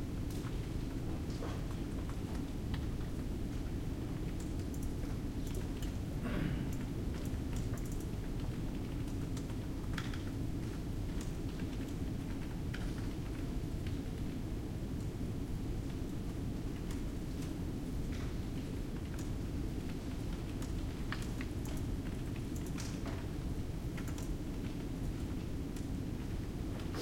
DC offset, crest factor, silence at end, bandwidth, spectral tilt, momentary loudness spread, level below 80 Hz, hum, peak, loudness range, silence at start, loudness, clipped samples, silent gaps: under 0.1%; 16 dB; 0 s; 16.5 kHz; -6.5 dB/octave; 2 LU; -44 dBFS; none; -24 dBFS; 1 LU; 0 s; -41 LUFS; under 0.1%; none